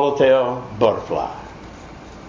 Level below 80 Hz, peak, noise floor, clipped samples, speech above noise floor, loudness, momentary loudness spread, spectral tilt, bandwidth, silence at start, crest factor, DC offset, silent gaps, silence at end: -46 dBFS; -4 dBFS; -38 dBFS; under 0.1%; 20 dB; -19 LUFS; 23 LU; -6.5 dB/octave; 7.2 kHz; 0 s; 16 dB; under 0.1%; none; 0 s